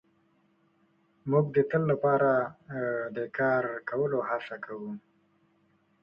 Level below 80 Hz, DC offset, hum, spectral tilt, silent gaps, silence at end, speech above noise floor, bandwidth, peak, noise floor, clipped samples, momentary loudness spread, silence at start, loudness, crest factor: -70 dBFS; under 0.1%; none; -10 dB/octave; none; 1.05 s; 40 dB; 5.6 kHz; -12 dBFS; -68 dBFS; under 0.1%; 14 LU; 1.25 s; -29 LUFS; 18 dB